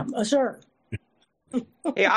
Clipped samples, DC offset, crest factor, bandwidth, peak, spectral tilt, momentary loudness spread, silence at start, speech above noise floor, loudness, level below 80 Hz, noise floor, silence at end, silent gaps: under 0.1%; under 0.1%; 20 dB; 12 kHz; -6 dBFS; -4.5 dB/octave; 16 LU; 0 s; 44 dB; -26 LUFS; -66 dBFS; -68 dBFS; 0 s; none